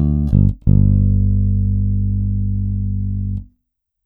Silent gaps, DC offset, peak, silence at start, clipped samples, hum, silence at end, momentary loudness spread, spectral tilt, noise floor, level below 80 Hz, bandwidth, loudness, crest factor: none; under 0.1%; -2 dBFS; 0 s; under 0.1%; 50 Hz at -30 dBFS; 0.6 s; 8 LU; -13.5 dB/octave; -73 dBFS; -22 dBFS; 1.3 kHz; -17 LUFS; 14 dB